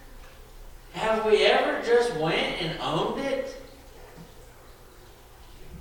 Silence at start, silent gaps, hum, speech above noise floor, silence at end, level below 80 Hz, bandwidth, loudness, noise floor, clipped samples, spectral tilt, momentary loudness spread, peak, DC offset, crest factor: 0 s; none; none; 25 dB; 0 s; -48 dBFS; 19 kHz; -25 LUFS; -49 dBFS; under 0.1%; -4.5 dB/octave; 23 LU; -8 dBFS; under 0.1%; 20 dB